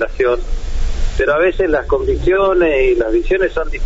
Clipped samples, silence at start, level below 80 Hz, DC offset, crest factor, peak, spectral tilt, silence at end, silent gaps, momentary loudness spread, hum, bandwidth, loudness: under 0.1%; 0 s; -20 dBFS; under 0.1%; 10 dB; -4 dBFS; -5 dB/octave; 0 s; none; 10 LU; none; 7.8 kHz; -15 LUFS